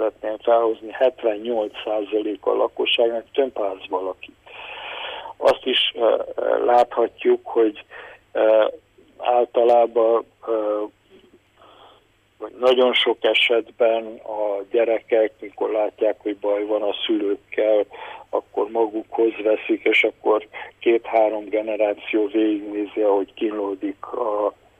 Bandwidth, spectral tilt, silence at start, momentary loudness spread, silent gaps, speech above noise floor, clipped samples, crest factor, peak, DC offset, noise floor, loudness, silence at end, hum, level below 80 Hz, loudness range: 9 kHz; -4.5 dB/octave; 0 s; 12 LU; none; 36 dB; under 0.1%; 16 dB; -6 dBFS; under 0.1%; -57 dBFS; -21 LUFS; 0.3 s; none; -66 dBFS; 3 LU